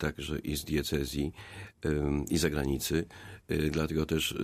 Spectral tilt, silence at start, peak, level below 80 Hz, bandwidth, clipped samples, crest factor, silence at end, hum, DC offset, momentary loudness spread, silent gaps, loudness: -5 dB/octave; 0 s; -14 dBFS; -44 dBFS; 15.5 kHz; under 0.1%; 18 dB; 0 s; none; under 0.1%; 8 LU; none; -32 LUFS